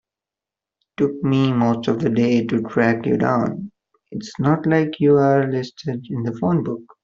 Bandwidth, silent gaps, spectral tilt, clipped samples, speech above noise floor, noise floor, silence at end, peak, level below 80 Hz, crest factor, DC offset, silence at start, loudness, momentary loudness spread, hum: 7.4 kHz; none; -8 dB/octave; under 0.1%; 69 dB; -88 dBFS; 0.2 s; -2 dBFS; -58 dBFS; 16 dB; under 0.1%; 1 s; -19 LUFS; 12 LU; none